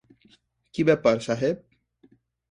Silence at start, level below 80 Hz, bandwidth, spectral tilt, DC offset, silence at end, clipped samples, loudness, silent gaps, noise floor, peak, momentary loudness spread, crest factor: 0.75 s; -62 dBFS; 10.5 kHz; -6.5 dB/octave; under 0.1%; 0.9 s; under 0.1%; -24 LUFS; none; -61 dBFS; -6 dBFS; 14 LU; 20 dB